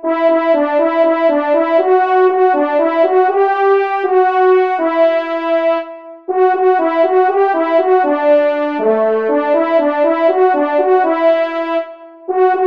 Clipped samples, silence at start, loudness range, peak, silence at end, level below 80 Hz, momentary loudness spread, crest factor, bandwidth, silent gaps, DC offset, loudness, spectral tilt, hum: under 0.1%; 0.05 s; 2 LU; -2 dBFS; 0 s; -68 dBFS; 5 LU; 12 dB; 5.2 kHz; none; 0.3%; -13 LUFS; -6 dB/octave; none